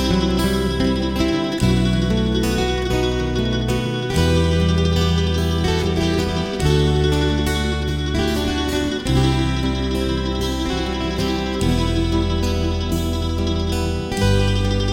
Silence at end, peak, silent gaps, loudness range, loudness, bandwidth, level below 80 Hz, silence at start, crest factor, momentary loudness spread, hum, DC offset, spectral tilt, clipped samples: 0 s; -4 dBFS; none; 2 LU; -20 LUFS; 17 kHz; -26 dBFS; 0 s; 14 dB; 4 LU; none; 0.2%; -6 dB/octave; under 0.1%